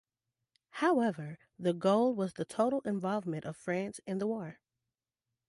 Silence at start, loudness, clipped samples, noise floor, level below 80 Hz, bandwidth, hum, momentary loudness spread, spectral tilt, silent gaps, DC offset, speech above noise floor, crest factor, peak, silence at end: 0.75 s; -33 LUFS; under 0.1%; under -90 dBFS; -76 dBFS; 11.5 kHz; none; 11 LU; -6.5 dB/octave; none; under 0.1%; over 57 dB; 18 dB; -16 dBFS; 0.95 s